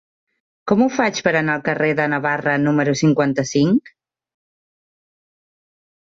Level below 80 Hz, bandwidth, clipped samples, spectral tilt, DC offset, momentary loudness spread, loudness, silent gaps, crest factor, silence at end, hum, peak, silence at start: -60 dBFS; 7.8 kHz; under 0.1%; -5.5 dB/octave; under 0.1%; 3 LU; -18 LUFS; none; 16 dB; 2.25 s; none; -4 dBFS; 0.65 s